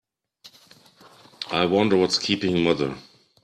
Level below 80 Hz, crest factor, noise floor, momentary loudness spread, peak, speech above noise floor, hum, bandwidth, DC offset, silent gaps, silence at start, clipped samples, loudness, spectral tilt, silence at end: -60 dBFS; 20 dB; -53 dBFS; 12 LU; -6 dBFS; 32 dB; none; 13 kHz; under 0.1%; none; 0.45 s; under 0.1%; -22 LUFS; -5 dB/octave; 0.4 s